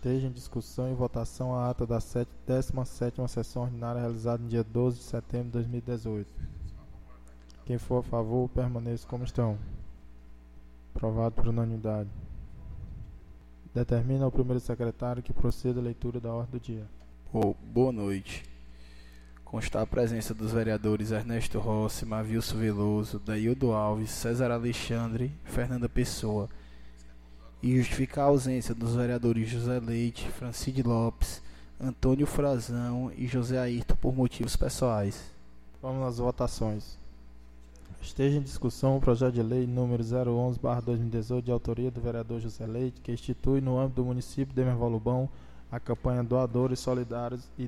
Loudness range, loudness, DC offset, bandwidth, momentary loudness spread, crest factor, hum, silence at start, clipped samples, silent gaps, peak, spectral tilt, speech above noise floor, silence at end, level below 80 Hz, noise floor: 5 LU; -31 LUFS; 0.1%; 15 kHz; 10 LU; 20 dB; none; 0 s; under 0.1%; none; -10 dBFS; -7 dB/octave; 24 dB; 0 s; -42 dBFS; -53 dBFS